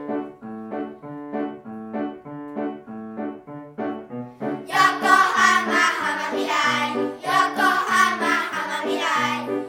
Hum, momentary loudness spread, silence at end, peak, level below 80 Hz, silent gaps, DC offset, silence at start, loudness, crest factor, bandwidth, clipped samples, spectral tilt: none; 18 LU; 0 s; -2 dBFS; -70 dBFS; none; under 0.1%; 0 s; -21 LUFS; 20 dB; 18.5 kHz; under 0.1%; -2.5 dB/octave